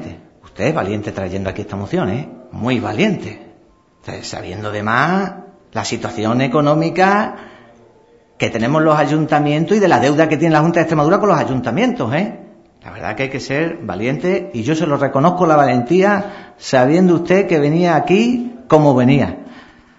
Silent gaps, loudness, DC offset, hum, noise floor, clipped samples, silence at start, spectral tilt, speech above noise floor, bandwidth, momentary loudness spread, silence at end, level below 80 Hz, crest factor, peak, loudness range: none; -15 LUFS; under 0.1%; none; -51 dBFS; under 0.1%; 0 s; -6.5 dB/octave; 35 dB; 8 kHz; 13 LU; 0.4 s; -50 dBFS; 16 dB; 0 dBFS; 7 LU